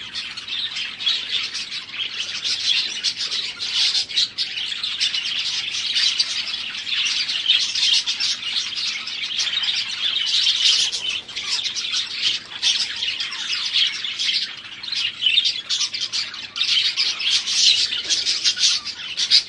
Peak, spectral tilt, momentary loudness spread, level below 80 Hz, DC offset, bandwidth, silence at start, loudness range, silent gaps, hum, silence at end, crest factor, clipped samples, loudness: -2 dBFS; 2.5 dB/octave; 9 LU; -66 dBFS; under 0.1%; 11.5 kHz; 0 s; 3 LU; none; none; 0 s; 22 dB; under 0.1%; -19 LUFS